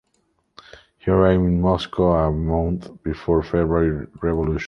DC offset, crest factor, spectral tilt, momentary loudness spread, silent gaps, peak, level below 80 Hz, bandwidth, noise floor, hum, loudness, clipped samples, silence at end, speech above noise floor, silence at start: under 0.1%; 18 dB; -9 dB/octave; 10 LU; none; -2 dBFS; -32 dBFS; 6.8 kHz; -67 dBFS; none; -21 LUFS; under 0.1%; 0 s; 48 dB; 1.05 s